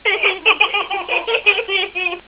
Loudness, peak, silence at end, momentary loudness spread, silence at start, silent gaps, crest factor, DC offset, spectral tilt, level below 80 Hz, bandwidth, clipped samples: -15 LUFS; 0 dBFS; 0.1 s; 6 LU; 0.05 s; none; 18 dB; under 0.1%; -4.5 dB/octave; -56 dBFS; 4 kHz; under 0.1%